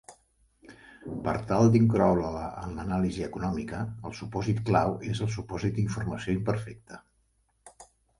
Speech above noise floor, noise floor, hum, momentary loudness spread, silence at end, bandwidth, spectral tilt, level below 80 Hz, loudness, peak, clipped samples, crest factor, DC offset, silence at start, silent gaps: 43 dB; -70 dBFS; none; 16 LU; 0.35 s; 11.5 kHz; -7.5 dB/octave; -48 dBFS; -28 LUFS; -8 dBFS; under 0.1%; 20 dB; under 0.1%; 0.1 s; none